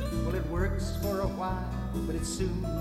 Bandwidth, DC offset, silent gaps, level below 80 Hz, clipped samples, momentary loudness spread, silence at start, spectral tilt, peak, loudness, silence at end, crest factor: 16 kHz; under 0.1%; none; -36 dBFS; under 0.1%; 3 LU; 0 s; -6 dB/octave; -16 dBFS; -32 LUFS; 0 s; 14 dB